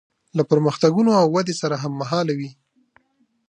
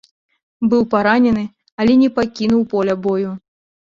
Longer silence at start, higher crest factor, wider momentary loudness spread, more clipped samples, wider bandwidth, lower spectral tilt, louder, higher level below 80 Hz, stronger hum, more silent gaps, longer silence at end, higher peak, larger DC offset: second, 0.35 s vs 0.6 s; about the same, 18 dB vs 14 dB; first, 11 LU vs 8 LU; neither; first, 10 kHz vs 7.2 kHz; about the same, -6.5 dB/octave vs -7 dB/octave; second, -20 LUFS vs -16 LUFS; second, -68 dBFS vs -50 dBFS; neither; second, none vs 1.72-1.78 s; first, 0.95 s vs 0.6 s; about the same, -4 dBFS vs -2 dBFS; neither